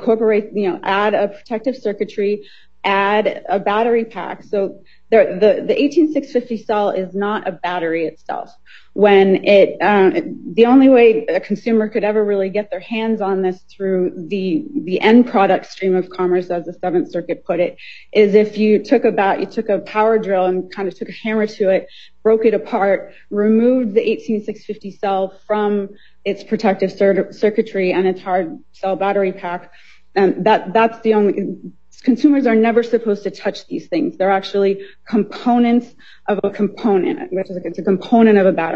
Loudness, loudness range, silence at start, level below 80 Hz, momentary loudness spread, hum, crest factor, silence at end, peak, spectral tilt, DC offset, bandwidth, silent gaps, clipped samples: -17 LUFS; 5 LU; 0 s; -60 dBFS; 12 LU; none; 16 dB; 0 s; 0 dBFS; -7.5 dB/octave; 0.7%; 7.2 kHz; none; under 0.1%